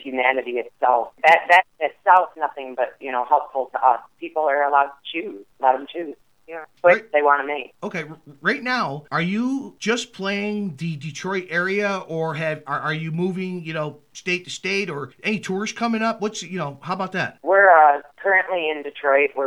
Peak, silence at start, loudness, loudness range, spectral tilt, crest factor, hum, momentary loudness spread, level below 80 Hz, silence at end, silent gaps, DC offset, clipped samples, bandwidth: -2 dBFS; 0 s; -21 LUFS; 6 LU; -5 dB/octave; 20 dB; none; 13 LU; -72 dBFS; 0 s; none; under 0.1%; under 0.1%; 12 kHz